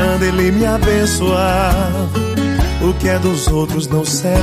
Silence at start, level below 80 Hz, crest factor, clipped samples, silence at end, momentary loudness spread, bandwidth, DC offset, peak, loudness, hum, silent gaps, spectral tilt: 0 s; -22 dBFS; 12 dB; under 0.1%; 0 s; 3 LU; 15.5 kHz; under 0.1%; -4 dBFS; -15 LUFS; none; none; -5.5 dB/octave